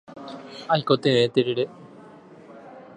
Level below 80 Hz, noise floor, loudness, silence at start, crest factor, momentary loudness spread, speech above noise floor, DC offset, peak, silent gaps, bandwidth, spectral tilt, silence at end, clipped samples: -68 dBFS; -47 dBFS; -22 LUFS; 0.1 s; 22 dB; 21 LU; 25 dB; under 0.1%; -4 dBFS; none; 10 kHz; -6 dB/octave; 0.15 s; under 0.1%